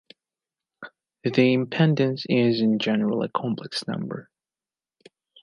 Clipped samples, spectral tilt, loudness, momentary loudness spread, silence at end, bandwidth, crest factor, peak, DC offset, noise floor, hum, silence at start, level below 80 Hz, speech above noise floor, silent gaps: under 0.1%; -7 dB/octave; -23 LUFS; 20 LU; 1.2 s; 11 kHz; 20 dB; -6 dBFS; under 0.1%; under -90 dBFS; none; 0.8 s; -72 dBFS; over 67 dB; none